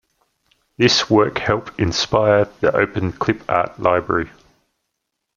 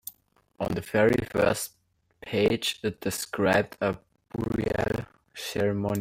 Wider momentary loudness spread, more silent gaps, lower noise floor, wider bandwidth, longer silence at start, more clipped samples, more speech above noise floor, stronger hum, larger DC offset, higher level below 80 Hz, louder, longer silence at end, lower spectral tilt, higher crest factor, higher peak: second, 7 LU vs 14 LU; neither; first, -77 dBFS vs -64 dBFS; second, 7.4 kHz vs 17 kHz; first, 0.8 s vs 0.05 s; neither; first, 59 dB vs 37 dB; neither; neither; first, -46 dBFS vs -52 dBFS; first, -18 LUFS vs -27 LUFS; first, 1.1 s vs 0 s; about the same, -4.5 dB/octave vs -5 dB/octave; about the same, 18 dB vs 18 dB; first, -2 dBFS vs -10 dBFS